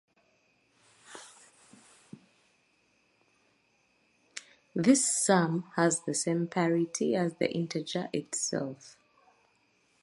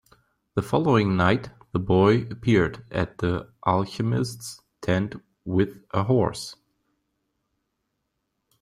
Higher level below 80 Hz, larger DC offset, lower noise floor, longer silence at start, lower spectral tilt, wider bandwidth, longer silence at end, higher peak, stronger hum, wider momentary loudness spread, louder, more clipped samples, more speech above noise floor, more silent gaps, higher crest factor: second, -80 dBFS vs -52 dBFS; neither; second, -71 dBFS vs -78 dBFS; first, 1.1 s vs 0.55 s; second, -4 dB/octave vs -7 dB/octave; second, 11.5 kHz vs 15.5 kHz; second, 1.15 s vs 2.1 s; second, -10 dBFS vs -6 dBFS; neither; first, 24 LU vs 13 LU; second, -29 LUFS vs -24 LUFS; neither; second, 42 dB vs 55 dB; neither; about the same, 22 dB vs 20 dB